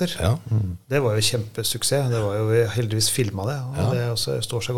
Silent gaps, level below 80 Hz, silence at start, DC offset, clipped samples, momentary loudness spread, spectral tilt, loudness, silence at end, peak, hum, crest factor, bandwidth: none; -48 dBFS; 0 s; 0.6%; under 0.1%; 5 LU; -4.5 dB/octave; -23 LUFS; 0 s; -6 dBFS; none; 16 dB; 17 kHz